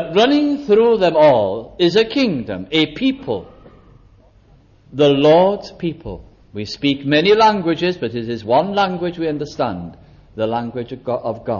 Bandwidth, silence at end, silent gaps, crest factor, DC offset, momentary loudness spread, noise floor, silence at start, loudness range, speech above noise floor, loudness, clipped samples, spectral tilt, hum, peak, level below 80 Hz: 7.2 kHz; 0 s; none; 14 dB; under 0.1%; 15 LU; -49 dBFS; 0 s; 5 LU; 33 dB; -17 LUFS; under 0.1%; -6.5 dB/octave; none; -2 dBFS; -48 dBFS